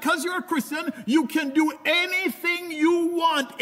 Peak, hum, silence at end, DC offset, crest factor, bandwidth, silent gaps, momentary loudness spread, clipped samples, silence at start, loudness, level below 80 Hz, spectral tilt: -10 dBFS; none; 0 s; under 0.1%; 14 dB; 16 kHz; none; 5 LU; under 0.1%; 0 s; -23 LUFS; -78 dBFS; -3 dB/octave